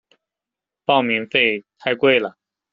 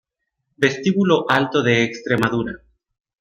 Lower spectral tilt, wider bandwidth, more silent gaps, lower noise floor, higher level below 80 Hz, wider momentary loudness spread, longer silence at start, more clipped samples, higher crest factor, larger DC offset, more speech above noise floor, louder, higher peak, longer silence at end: second, -1.5 dB/octave vs -5.5 dB/octave; second, 6.8 kHz vs 15 kHz; neither; first, -87 dBFS vs -75 dBFS; second, -66 dBFS vs -54 dBFS; first, 10 LU vs 7 LU; first, 0.9 s vs 0.6 s; neither; about the same, 18 dB vs 18 dB; neither; first, 69 dB vs 57 dB; about the same, -18 LUFS vs -19 LUFS; about the same, -2 dBFS vs -2 dBFS; second, 0.4 s vs 0.65 s